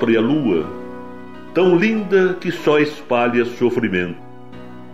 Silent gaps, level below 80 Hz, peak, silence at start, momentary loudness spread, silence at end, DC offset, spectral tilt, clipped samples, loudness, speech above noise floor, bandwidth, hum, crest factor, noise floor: none; -56 dBFS; -4 dBFS; 0 s; 20 LU; 0 s; 1%; -7 dB/octave; under 0.1%; -18 LUFS; 21 dB; 11 kHz; none; 16 dB; -37 dBFS